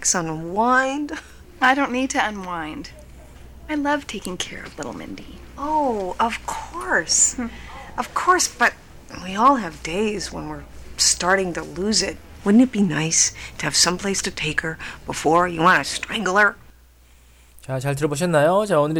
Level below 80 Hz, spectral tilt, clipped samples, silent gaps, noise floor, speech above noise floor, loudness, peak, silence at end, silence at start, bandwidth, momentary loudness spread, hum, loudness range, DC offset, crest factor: -44 dBFS; -3 dB/octave; under 0.1%; none; -51 dBFS; 30 dB; -20 LUFS; -4 dBFS; 0 s; 0 s; 19 kHz; 16 LU; none; 7 LU; under 0.1%; 18 dB